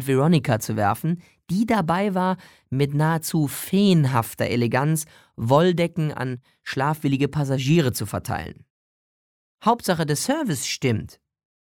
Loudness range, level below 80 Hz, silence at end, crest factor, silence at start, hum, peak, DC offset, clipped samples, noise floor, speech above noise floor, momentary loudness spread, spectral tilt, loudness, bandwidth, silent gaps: 4 LU; -56 dBFS; 0.55 s; 18 dB; 0 s; none; -4 dBFS; under 0.1%; under 0.1%; under -90 dBFS; over 68 dB; 12 LU; -6 dB/octave; -23 LUFS; 19 kHz; 8.70-9.58 s